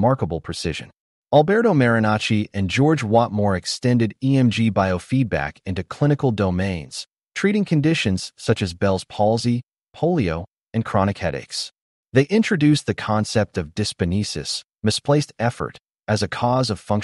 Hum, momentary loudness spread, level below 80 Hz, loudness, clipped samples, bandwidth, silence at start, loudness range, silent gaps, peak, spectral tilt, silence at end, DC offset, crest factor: none; 10 LU; -48 dBFS; -21 LUFS; under 0.1%; 11.5 kHz; 0 s; 4 LU; 1.00-1.23 s, 11.81-12.04 s; -2 dBFS; -6 dB/octave; 0 s; under 0.1%; 18 dB